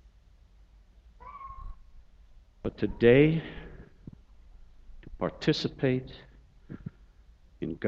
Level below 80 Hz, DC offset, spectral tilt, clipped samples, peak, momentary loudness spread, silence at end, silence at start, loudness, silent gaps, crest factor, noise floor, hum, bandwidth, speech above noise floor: -50 dBFS; under 0.1%; -7.5 dB/octave; under 0.1%; -8 dBFS; 29 LU; 0 s; 1.25 s; -27 LUFS; none; 24 dB; -58 dBFS; none; 7.6 kHz; 32 dB